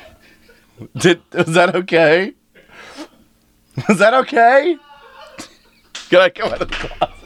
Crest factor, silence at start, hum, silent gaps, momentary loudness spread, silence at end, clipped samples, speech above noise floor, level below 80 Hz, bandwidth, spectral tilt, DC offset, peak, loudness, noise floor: 16 dB; 0.8 s; none; none; 23 LU; 0.15 s; under 0.1%; 41 dB; -42 dBFS; 13.5 kHz; -5 dB/octave; under 0.1%; 0 dBFS; -15 LUFS; -55 dBFS